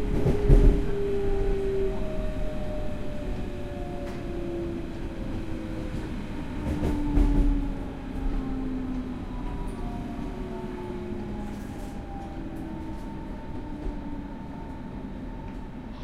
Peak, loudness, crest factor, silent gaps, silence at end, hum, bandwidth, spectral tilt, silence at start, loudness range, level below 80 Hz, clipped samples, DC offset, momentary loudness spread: -6 dBFS; -32 LUFS; 22 dB; none; 0 s; none; 10 kHz; -8 dB/octave; 0 s; 8 LU; -30 dBFS; under 0.1%; under 0.1%; 12 LU